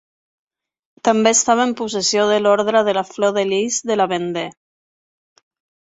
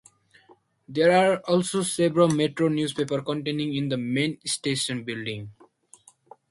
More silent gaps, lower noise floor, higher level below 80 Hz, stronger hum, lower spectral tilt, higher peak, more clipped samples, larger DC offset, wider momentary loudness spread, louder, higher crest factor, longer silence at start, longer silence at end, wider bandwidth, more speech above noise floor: neither; first, under -90 dBFS vs -59 dBFS; about the same, -64 dBFS vs -66 dBFS; neither; second, -2.5 dB/octave vs -5 dB/octave; first, -2 dBFS vs -8 dBFS; neither; neither; second, 8 LU vs 11 LU; first, -17 LUFS vs -24 LUFS; about the same, 18 dB vs 18 dB; first, 1.05 s vs 0.9 s; first, 1.45 s vs 1 s; second, 8.4 kHz vs 11.5 kHz; first, over 73 dB vs 35 dB